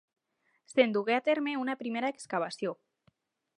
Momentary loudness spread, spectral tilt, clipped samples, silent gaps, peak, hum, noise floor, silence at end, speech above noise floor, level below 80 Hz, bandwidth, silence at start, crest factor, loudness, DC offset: 10 LU; -4.5 dB/octave; under 0.1%; none; -10 dBFS; none; -76 dBFS; 0.85 s; 45 dB; -88 dBFS; 11 kHz; 0.75 s; 24 dB; -31 LUFS; under 0.1%